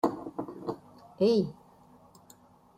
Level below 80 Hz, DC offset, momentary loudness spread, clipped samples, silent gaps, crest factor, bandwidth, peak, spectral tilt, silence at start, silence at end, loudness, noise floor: -70 dBFS; under 0.1%; 14 LU; under 0.1%; none; 22 dB; 15.5 kHz; -12 dBFS; -7.5 dB/octave; 0.05 s; 1.25 s; -31 LUFS; -58 dBFS